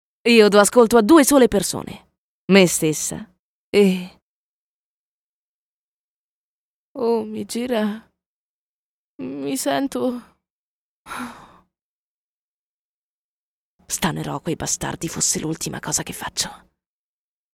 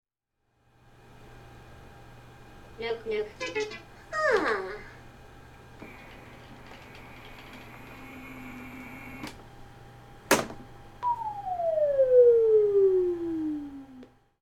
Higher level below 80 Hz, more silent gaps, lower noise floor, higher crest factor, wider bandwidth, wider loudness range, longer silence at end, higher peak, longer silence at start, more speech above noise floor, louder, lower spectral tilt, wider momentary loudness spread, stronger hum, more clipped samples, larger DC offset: about the same, -52 dBFS vs -56 dBFS; first, 2.18-2.48 s, 3.39-3.73 s, 4.22-6.95 s, 8.26-9.19 s, 10.50-11.05 s, 11.81-13.79 s vs none; first, under -90 dBFS vs -78 dBFS; about the same, 22 dB vs 24 dB; about the same, 19 kHz vs 17.5 kHz; second, 15 LU vs 21 LU; first, 1 s vs 0.35 s; first, 0 dBFS vs -6 dBFS; second, 0.25 s vs 1.3 s; first, over 71 dB vs 48 dB; first, -19 LUFS vs -26 LUFS; about the same, -4 dB/octave vs -4 dB/octave; second, 21 LU vs 26 LU; neither; neither; neither